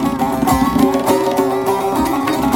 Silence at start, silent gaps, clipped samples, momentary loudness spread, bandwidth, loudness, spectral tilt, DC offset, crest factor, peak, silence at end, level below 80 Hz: 0 s; none; under 0.1%; 3 LU; 17 kHz; -15 LUFS; -5.5 dB/octave; under 0.1%; 14 dB; 0 dBFS; 0 s; -36 dBFS